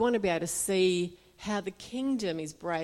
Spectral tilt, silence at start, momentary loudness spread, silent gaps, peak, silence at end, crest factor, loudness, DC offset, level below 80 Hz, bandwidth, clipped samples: -4 dB/octave; 0 s; 11 LU; none; -16 dBFS; 0 s; 14 dB; -31 LUFS; under 0.1%; -62 dBFS; 16 kHz; under 0.1%